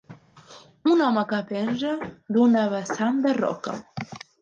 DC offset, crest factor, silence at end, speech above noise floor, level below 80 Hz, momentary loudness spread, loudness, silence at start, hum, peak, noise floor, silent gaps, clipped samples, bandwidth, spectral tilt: under 0.1%; 16 dB; 0.25 s; 27 dB; -68 dBFS; 14 LU; -24 LUFS; 0.1 s; none; -8 dBFS; -49 dBFS; none; under 0.1%; 7.6 kHz; -6 dB/octave